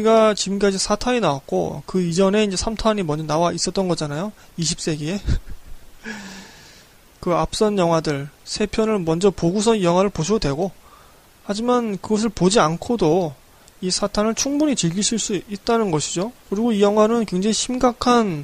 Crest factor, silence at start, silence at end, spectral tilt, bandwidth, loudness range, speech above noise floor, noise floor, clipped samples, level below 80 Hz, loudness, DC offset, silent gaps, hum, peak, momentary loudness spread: 16 dB; 0 s; 0 s; -4.5 dB/octave; 15.5 kHz; 5 LU; 29 dB; -49 dBFS; under 0.1%; -38 dBFS; -20 LUFS; under 0.1%; none; none; -4 dBFS; 11 LU